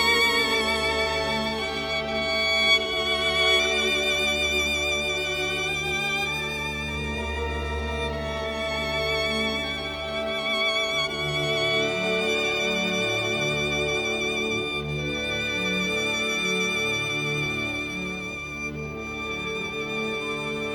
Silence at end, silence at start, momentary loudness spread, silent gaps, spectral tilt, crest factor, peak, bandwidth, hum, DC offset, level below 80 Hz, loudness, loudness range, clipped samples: 0 s; 0 s; 9 LU; none; -3 dB/octave; 16 dB; -10 dBFS; 17 kHz; none; under 0.1%; -42 dBFS; -24 LUFS; 6 LU; under 0.1%